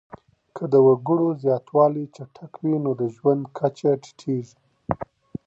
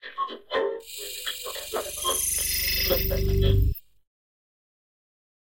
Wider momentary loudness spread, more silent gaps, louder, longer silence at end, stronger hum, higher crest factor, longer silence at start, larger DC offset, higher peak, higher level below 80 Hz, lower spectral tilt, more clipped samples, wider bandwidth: first, 19 LU vs 10 LU; neither; first, -22 LUFS vs -26 LUFS; second, 0.45 s vs 1.65 s; neither; about the same, 20 dB vs 20 dB; first, 0.55 s vs 0.05 s; second, under 0.1% vs 0.1%; first, -2 dBFS vs -8 dBFS; second, -58 dBFS vs -32 dBFS; first, -9 dB/octave vs -3.5 dB/octave; neither; second, 7.8 kHz vs 17 kHz